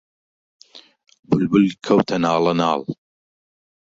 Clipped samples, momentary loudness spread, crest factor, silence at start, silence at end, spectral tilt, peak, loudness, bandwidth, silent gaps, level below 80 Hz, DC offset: under 0.1%; 9 LU; 20 dB; 0.75 s; 1 s; -7 dB/octave; -2 dBFS; -19 LUFS; 7.8 kHz; 1.19-1.23 s; -58 dBFS; under 0.1%